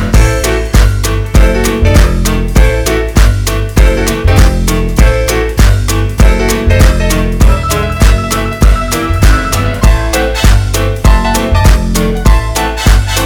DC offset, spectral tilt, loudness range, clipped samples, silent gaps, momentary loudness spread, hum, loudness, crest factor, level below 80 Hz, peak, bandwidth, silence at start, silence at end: under 0.1%; -5 dB/octave; 1 LU; 5%; none; 4 LU; none; -10 LUFS; 8 dB; -10 dBFS; 0 dBFS; 18 kHz; 0 s; 0 s